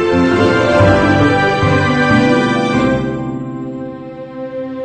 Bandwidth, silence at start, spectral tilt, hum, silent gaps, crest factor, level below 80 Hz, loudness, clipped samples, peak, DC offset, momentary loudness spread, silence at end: 9.2 kHz; 0 s; -6.5 dB/octave; none; none; 14 dB; -36 dBFS; -12 LUFS; under 0.1%; 0 dBFS; 0.2%; 15 LU; 0 s